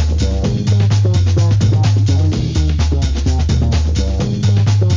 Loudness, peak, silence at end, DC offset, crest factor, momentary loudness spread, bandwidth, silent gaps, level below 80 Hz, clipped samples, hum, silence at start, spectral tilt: -15 LUFS; -4 dBFS; 0 s; 0.2%; 10 dB; 4 LU; 7.6 kHz; none; -18 dBFS; under 0.1%; none; 0 s; -6.5 dB/octave